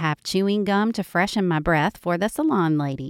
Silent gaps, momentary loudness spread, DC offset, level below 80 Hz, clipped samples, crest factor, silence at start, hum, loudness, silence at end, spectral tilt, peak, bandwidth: none; 3 LU; under 0.1%; -46 dBFS; under 0.1%; 14 dB; 0 s; none; -22 LUFS; 0 s; -6 dB/octave; -8 dBFS; 16 kHz